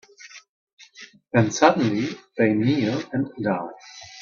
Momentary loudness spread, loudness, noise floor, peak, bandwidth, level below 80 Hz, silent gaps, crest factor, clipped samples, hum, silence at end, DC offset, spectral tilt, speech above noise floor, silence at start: 25 LU; -22 LUFS; -47 dBFS; -2 dBFS; 7.4 kHz; -64 dBFS; 0.49-0.67 s, 0.73-0.77 s; 22 dB; under 0.1%; none; 0 s; under 0.1%; -6 dB/octave; 26 dB; 0.2 s